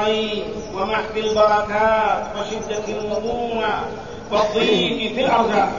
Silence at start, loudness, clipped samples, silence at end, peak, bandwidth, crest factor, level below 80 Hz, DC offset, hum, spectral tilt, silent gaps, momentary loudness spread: 0 s; -20 LUFS; under 0.1%; 0 s; -4 dBFS; 7.4 kHz; 16 dB; -46 dBFS; 0.6%; none; -4.5 dB/octave; none; 9 LU